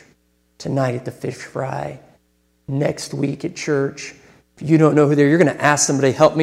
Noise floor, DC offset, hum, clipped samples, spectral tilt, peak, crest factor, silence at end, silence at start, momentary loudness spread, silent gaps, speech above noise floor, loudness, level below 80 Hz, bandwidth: -62 dBFS; under 0.1%; none; under 0.1%; -5.5 dB/octave; 0 dBFS; 18 dB; 0 s; 0.6 s; 15 LU; none; 45 dB; -18 LUFS; -58 dBFS; 14.5 kHz